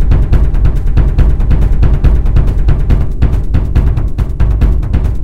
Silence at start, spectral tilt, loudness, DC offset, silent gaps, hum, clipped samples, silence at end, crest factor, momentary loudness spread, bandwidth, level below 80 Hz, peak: 0 s; -9 dB/octave; -13 LUFS; 10%; none; none; 1%; 0 s; 10 dB; 3 LU; 4.6 kHz; -10 dBFS; 0 dBFS